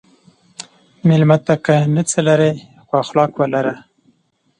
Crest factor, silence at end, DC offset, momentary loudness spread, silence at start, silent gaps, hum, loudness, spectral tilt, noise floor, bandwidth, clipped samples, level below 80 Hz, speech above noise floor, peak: 16 dB; 0.8 s; under 0.1%; 20 LU; 1.05 s; none; none; -16 LUFS; -6 dB/octave; -61 dBFS; 10.5 kHz; under 0.1%; -60 dBFS; 46 dB; 0 dBFS